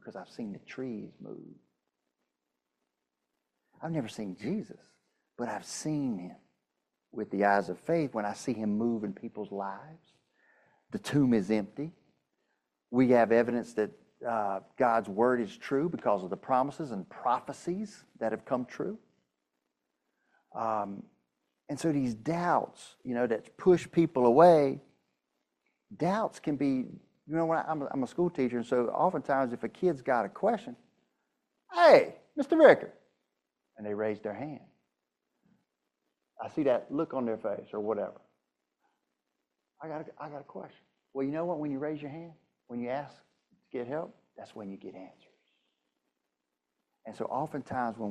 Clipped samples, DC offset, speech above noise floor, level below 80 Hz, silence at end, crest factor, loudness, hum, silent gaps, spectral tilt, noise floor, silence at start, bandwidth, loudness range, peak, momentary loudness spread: under 0.1%; under 0.1%; 56 dB; -72 dBFS; 0 s; 26 dB; -30 LUFS; none; none; -6.5 dB/octave; -85 dBFS; 0.05 s; 12.5 kHz; 15 LU; -6 dBFS; 19 LU